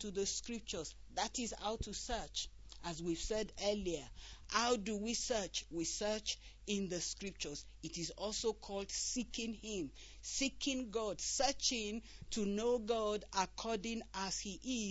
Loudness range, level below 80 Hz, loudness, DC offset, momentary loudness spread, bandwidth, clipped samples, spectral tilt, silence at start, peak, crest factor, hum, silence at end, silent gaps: 4 LU; -56 dBFS; -40 LUFS; under 0.1%; 9 LU; 8.2 kHz; under 0.1%; -2.5 dB/octave; 0 s; -20 dBFS; 20 dB; none; 0 s; none